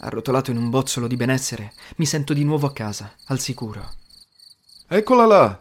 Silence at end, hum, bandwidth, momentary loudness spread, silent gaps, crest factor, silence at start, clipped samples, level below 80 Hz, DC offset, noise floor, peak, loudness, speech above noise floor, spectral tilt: 0.05 s; none; 16.5 kHz; 18 LU; none; 18 dB; 0.05 s; under 0.1%; -50 dBFS; under 0.1%; -51 dBFS; -2 dBFS; -20 LUFS; 31 dB; -5.5 dB/octave